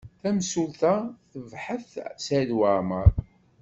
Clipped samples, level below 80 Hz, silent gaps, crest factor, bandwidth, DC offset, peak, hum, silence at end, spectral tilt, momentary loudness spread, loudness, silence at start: under 0.1%; -34 dBFS; none; 22 dB; 8 kHz; under 0.1%; -4 dBFS; none; 0.4 s; -6 dB/octave; 15 LU; -26 LUFS; 0.05 s